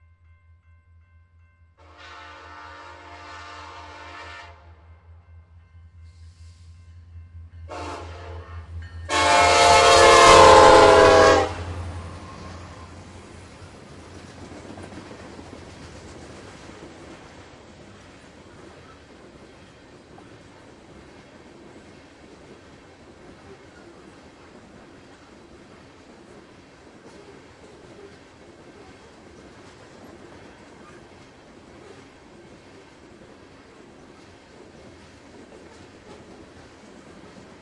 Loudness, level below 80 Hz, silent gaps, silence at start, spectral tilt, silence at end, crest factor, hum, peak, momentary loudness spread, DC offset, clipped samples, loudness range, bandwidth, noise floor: -13 LUFS; -48 dBFS; none; 7.7 s; -3 dB/octave; 25.45 s; 24 dB; none; 0 dBFS; 32 LU; under 0.1%; under 0.1%; 29 LU; 11.5 kHz; -56 dBFS